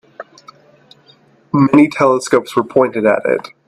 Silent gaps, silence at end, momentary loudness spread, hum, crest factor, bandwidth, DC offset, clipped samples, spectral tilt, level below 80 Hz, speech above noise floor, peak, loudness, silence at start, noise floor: none; 0.25 s; 8 LU; none; 16 dB; 12 kHz; under 0.1%; under 0.1%; -6.5 dB/octave; -58 dBFS; 37 dB; 0 dBFS; -14 LUFS; 0.2 s; -50 dBFS